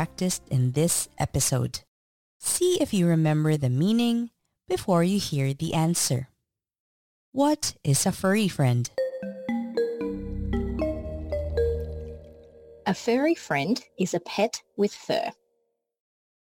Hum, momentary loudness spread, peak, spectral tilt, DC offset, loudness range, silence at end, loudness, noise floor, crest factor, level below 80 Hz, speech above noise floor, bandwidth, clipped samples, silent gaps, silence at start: none; 10 LU; -12 dBFS; -5 dB/octave; under 0.1%; 5 LU; 1.15 s; -26 LUFS; -79 dBFS; 14 dB; -44 dBFS; 54 dB; 17 kHz; under 0.1%; 1.88-2.40 s, 6.79-7.32 s; 0 s